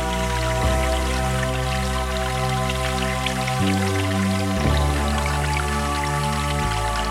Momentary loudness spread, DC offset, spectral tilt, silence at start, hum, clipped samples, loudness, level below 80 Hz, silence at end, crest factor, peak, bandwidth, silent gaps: 2 LU; under 0.1%; -4.5 dB/octave; 0 s; none; under 0.1%; -22 LUFS; -28 dBFS; 0 s; 14 dB; -6 dBFS; 16 kHz; none